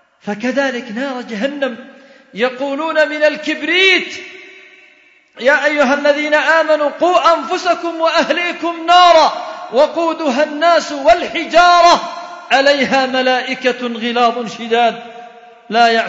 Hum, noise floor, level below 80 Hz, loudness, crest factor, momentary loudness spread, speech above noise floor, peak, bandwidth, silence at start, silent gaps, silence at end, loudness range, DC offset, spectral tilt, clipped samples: none; -49 dBFS; -52 dBFS; -13 LUFS; 14 dB; 13 LU; 35 dB; 0 dBFS; 7.8 kHz; 0.25 s; none; 0 s; 4 LU; under 0.1%; -3 dB/octave; under 0.1%